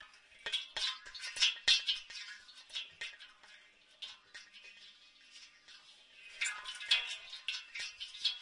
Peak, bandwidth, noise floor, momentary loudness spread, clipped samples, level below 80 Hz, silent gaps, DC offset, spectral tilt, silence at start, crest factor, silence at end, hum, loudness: -14 dBFS; 11.5 kHz; -63 dBFS; 25 LU; under 0.1%; -74 dBFS; none; under 0.1%; 3.5 dB/octave; 0 s; 28 dB; 0 s; none; -35 LUFS